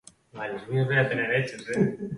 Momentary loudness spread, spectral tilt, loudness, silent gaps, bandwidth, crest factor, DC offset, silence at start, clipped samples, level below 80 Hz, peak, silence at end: 12 LU; -6.5 dB/octave; -26 LUFS; none; 11.5 kHz; 18 dB; under 0.1%; 0.35 s; under 0.1%; -62 dBFS; -10 dBFS; 0 s